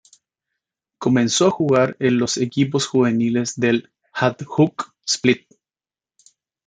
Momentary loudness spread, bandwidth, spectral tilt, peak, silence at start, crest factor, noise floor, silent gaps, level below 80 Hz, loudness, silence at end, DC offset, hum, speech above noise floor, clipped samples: 6 LU; 9.4 kHz; -4.5 dB/octave; 0 dBFS; 1 s; 20 dB; under -90 dBFS; none; -62 dBFS; -19 LUFS; 1.3 s; under 0.1%; none; over 71 dB; under 0.1%